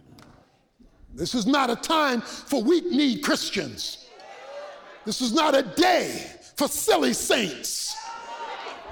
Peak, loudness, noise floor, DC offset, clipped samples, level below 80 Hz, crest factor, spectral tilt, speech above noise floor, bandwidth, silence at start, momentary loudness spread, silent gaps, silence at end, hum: -8 dBFS; -24 LUFS; -58 dBFS; under 0.1%; under 0.1%; -58 dBFS; 16 dB; -3 dB/octave; 34 dB; over 20 kHz; 0.15 s; 18 LU; none; 0 s; none